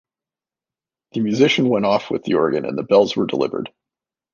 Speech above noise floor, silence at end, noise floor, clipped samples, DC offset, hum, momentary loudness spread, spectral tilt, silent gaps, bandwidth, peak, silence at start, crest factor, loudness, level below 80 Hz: 72 dB; 0.65 s; -90 dBFS; under 0.1%; under 0.1%; none; 10 LU; -6 dB/octave; none; 7.2 kHz; -2 dBFS; 1.15 s; 18 dB; -18 LUFS; -60 dBFS